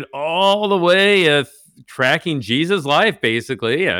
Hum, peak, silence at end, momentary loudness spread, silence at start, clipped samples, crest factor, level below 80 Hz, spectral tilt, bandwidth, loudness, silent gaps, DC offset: none; -4 dBFS; 0 s; 8 LU; 0 s; under 0.1%; 12 dB; -64 dBFS; -4.5 dB/octave; 18 kHz; -16 LUFS; none; under 0.1%